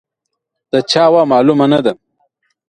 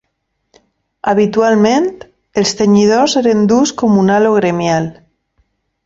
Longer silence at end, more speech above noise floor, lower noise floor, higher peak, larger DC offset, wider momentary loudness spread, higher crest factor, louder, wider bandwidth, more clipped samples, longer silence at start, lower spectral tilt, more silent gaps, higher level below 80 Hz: second, 0.75 s vs 0.95 s; first, 65 dB vs 58 dB; first, -76 dBFS vs -69 dBFS; about the same, 0 dBFS vs 0 dBFS; neither; about the same, 9 LU vs 7 LU; about the same, 14 dB vs 12 dB; about the same, -12 LUFS vs -12 LUFS; first, 10 kHz vs 7.8 kHz; neither; second, 0.75 s vs 1.05 s; about the same, -5.5 dB/octave vs -5.5 dB/octave; neither; second, -58 dBFS vs -52 dBFS